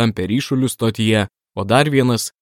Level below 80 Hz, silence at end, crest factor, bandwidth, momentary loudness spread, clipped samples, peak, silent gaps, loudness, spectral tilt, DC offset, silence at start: -52 dBFS; 0.15 s; 18 dB; 16.5 kHz; 6 LU; under 0.1%; 0 dBFS; none; -17 LUFS; -5.5 dB/octave; under 0.1%; 0 s